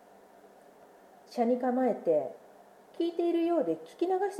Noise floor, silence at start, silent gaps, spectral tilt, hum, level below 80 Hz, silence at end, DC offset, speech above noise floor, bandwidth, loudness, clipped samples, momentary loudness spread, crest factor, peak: -56 dBFS; 1.3 s; none; -6.5 dB/octave; none; -86 dBFS; 0 s; under 0.1%; 27 dB; 13 kHz; -30 LUFS; under 0.1%; 10 LU; 14 dB; -16 dBFS